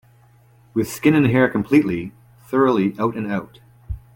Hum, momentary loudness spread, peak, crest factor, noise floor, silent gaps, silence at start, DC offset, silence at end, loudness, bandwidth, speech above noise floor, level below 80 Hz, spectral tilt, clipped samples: none; 12 LU; -2 dBFS; 18 dB; -52 dBFS; none; 0.75 s; under 0.1%; 0.2 s; -19 LUFS; 17 kHz; 34 dB; -44 dBFS; -7 dB/octave; under 0.1%